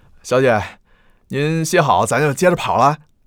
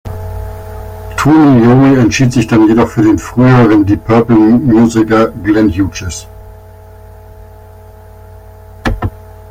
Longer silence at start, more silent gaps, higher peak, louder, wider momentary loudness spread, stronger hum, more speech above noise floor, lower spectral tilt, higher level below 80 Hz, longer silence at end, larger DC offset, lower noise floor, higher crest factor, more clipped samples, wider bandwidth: first, 0.25 s vs 0.05 s; neither; about the same, -2 dBFS vs 0 dBFS; second, -16 LUFS vs -9 LUFS; second, 7 LU vs 18 LU; neither; first, 37 dB vs 26 dB; second, -5 dB/octave vs -7 dB/octave; second, -50 dBFS vs -30 dBFS; about the same, 0.3 s vs 0.35 s; neither; first, -53 dBFS vs -34 dBFS; first, 16 dB vs 10 dB; neither; first, 18.5 kHz vs 15.5 kHz